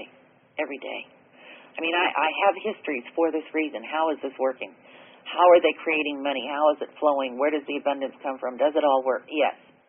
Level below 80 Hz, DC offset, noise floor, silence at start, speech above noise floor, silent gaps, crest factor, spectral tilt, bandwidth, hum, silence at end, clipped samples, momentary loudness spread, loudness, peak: -78 dBFS; under 0.1%; -56 dBFS; 0 s; 32 dB; none; 18 dB; 3 dB/octave; 3.6 kHz; none; 0.35 s; under 0.1%; 12 LU; -24 LUFS; -6 dBFS